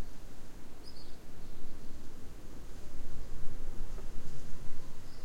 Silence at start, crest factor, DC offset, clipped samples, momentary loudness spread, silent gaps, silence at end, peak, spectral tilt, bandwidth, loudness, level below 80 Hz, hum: 0 s; 12 dB; under 0.1%; under 0.1%; 6 LU; none; 0 s; -16 dBFS; -5.5 dB/octave; 7.6 kHz; -50 LUFS; -40 dBFS; none